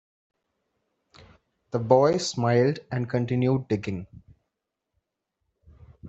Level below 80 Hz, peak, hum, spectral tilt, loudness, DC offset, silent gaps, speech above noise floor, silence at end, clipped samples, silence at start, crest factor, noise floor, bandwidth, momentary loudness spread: -62 dBFS; -4 dBFS; none; -6.5 dB/octave; -24 LUFS; under 0.1%; none; 59 dB; 0 s; under 0.1%; 1.75 s; 22 dB; -83 dBFS; 8.2 kHz; 12 LU